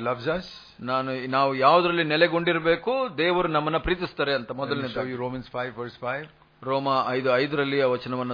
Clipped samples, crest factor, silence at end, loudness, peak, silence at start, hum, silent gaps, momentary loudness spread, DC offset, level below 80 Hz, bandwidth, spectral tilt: under 0.1%; 20 dB; 0 s; -25 LUFS; -4 dBFS; 0 s; none; none; 11 LU; under 0.1%; -50 dBFS; 5.2 kHz; -7.5 dB/octave